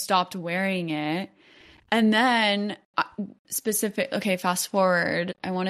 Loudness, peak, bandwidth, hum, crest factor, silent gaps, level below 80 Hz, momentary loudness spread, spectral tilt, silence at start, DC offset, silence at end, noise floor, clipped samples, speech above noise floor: -25 LUFS; -8 dBFS; 15.5 kHz; none; 18 dB; 2.85-2.94 s, 3.39-3.45 s; -70 dBFS; 10 LU; -4 dB/octave; 0 s; under 0.1%; 0 s; -54 dBFS; under 0.1%; 29 dB